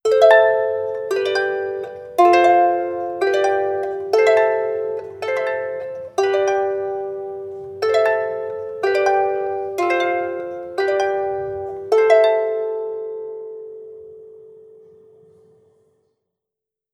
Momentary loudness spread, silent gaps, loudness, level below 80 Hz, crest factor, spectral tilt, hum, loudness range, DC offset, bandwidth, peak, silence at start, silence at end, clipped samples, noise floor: 16 LU; none; -19 LUFS; -66 dBFS; 20 dB; -4 dB/octave; none; 6 LU; under 0.1%; 13 kHz; 0 dBFS; 0.05 s; 2.4 s; under 0.1%; -84 dBFS